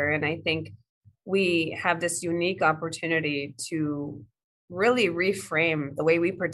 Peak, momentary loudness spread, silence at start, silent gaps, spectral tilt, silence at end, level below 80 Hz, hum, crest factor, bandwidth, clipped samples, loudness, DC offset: -6 dBFS; 8 LU; 0 s; 0.89-1.01 s, 4.44-4.68 s; -4.5 dB/octave; 0 s; -68 dBFS; none; 20 dB; 12.5 kHz; under 0.1%; -26 LUFS; under 0.1%